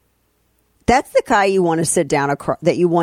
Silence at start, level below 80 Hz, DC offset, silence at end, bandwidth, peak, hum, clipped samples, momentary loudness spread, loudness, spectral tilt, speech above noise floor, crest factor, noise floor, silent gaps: 0.9 s; -42 dBFS; under 0.1%; 0 s; 15 kHz; -2 dBFS; none; under 0.1%; 4 LU; -17 LUFS; -5 dB/octave; 47 dB; 16 dB; -63 dBFS; none